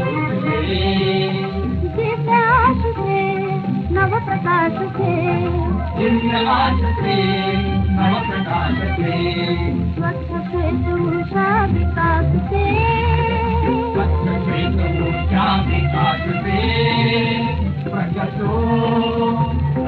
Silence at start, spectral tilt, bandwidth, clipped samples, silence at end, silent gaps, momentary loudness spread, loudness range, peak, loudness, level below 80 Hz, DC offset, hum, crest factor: 0 s; -9.5 dB/octave; 4.9 kHz; under 0.1%; 0 s; none; 5 LU; 2 LU; -2 dBFS; -18 LUFS; -28 dBFS; under 0.1%; none; 14 dB